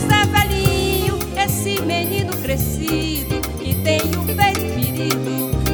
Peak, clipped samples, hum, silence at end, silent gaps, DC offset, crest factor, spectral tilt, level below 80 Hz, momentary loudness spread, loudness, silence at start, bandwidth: -2 dBFS; under 0.1%; none; 0 s; none; under 0.1%; 18 dB; -4.5 dB/octave; -30 dBFS; 5 LU; -19 LUFS; 0 s; over 20 kHz